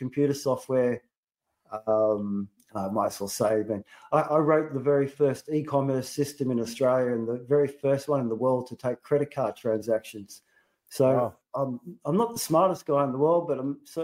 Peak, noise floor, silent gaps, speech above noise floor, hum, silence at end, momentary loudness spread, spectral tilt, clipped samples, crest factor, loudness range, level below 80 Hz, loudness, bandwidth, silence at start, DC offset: -8 dBFS; -84 dBFS; 1.17-1.23 s; 58 dB; none; 0 s; 10 LU; -6.5 dB/octave; under 0.1%; 18 dB; 3 LU; -70 dBFS; -27 LUFS; 16 kHz; 0 s; under 0.1%